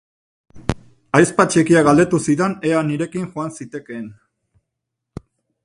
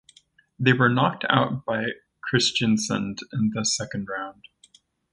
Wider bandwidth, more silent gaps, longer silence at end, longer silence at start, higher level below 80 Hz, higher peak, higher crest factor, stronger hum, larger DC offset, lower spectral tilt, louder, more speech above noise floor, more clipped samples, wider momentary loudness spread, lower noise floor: about the same, 11.5 kHz vs 11.5 kHz; neither; first, 1.55 s vs 0.8 s; about the same, 0.55 s vs 0.6 s; first, -46 dBFS vs -60 dBFS; first, 0 dBFS vs -4 dBFS; about the same, 20 dB vs 22 dB; neither; neither; first, -6 dB/octave vs -4 dB/octave; first, -17 LUFS vs -23 LUFS; first, 63 dB vs 35 dB; neither; first, 23 LU vs 12 LU; first, -80 dBFS vs -58 dBFS